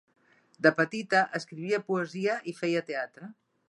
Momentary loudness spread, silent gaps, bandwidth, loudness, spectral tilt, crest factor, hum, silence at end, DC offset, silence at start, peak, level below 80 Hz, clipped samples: 11 LU; none; 11.5 kHz; -29 LUFS; -5.5 dB/octave; 22 dB; none; 0.35 s; under 0.1%; 0.6 s; -8 dBFS; -82 dBFS; under 0.1%